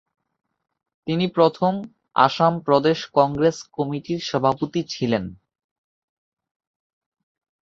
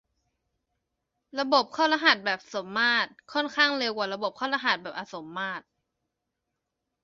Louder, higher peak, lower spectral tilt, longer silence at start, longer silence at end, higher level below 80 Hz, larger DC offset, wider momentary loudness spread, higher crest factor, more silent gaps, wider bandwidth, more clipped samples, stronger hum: first, -21 LUFS vs -26 LUFS; about the same, -2 dBFS vs -4 dBFS; first, -6 dB/octave vs -3 dB/octave; second, 1.05 s vs 1.35 s; first, 2.4 s vs 1.45 s; first, -60 dBFS vs -76 dBFS; neither; second, 9 LU vs 14 LU; about the same, 22 dB vs 26 dB; neither; about the same, 7.8 kHz vs 7.6 kHz; neither; neither